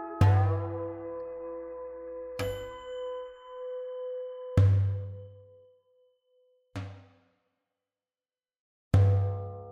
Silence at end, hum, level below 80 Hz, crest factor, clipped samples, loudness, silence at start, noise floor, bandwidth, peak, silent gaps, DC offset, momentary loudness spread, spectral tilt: 0 s; none; -52 dBFS; 20 dB; under 0.1%; -30 LUFS; 0 s; under -90 dBFS; 11 kHz; -12 dBFS; 8.60-8.91 s; under 0.1%; 18 LU; -8.5 dB/octave